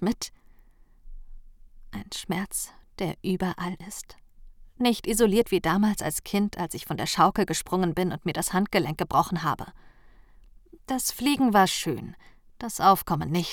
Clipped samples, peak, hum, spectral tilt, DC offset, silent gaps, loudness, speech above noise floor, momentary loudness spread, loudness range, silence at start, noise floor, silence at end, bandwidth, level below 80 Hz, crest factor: under 0.1%; -6 dBFS; none; -4.5 dB/octave; under 0.1%; none; -26 LUFS; 29 dB; 16 LU; 8 LU; 0 s; -54 dBFS; 0 s; over 20 kHz; -48 dBFS; 22 dB